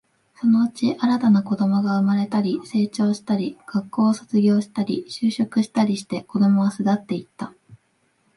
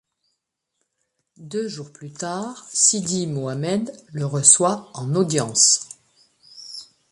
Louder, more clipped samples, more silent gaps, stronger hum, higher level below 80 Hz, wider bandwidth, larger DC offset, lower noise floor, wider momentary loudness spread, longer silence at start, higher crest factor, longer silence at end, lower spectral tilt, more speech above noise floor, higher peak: about the same, -21 LUFS vs -19 LUFS; neither; neither; neither; about the same, -68 dBFS vs -66 dBFS; about the same, 11.5 kHz vs 11.5 kHz; neither; second, -66 dBFS vs -78 dBFS; second, 8 LU vs 22 LU; second, 0.4 s vs 1.4 s; second, 14 dB vs 24 dB; first, 0.6 s vs 0.3 s; first, -7 dB/octave vs -3 dB/octave; second, 46 dB vs 56 dB; second, -6 dBFS vs 0 dBFS